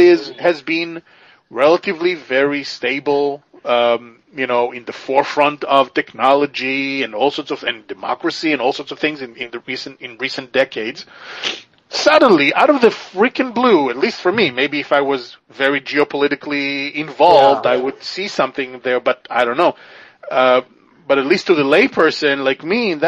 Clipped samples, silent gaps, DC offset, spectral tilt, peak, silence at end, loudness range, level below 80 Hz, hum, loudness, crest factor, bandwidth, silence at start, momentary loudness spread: under 0.1%; none; under 0.1%; -4.5 dB/octave; 0 dBFS; 0 s; 6 LU; -64 dBFS; none; -16 LUFS; 16 dB; 9 kHz; 0 s; 13 LU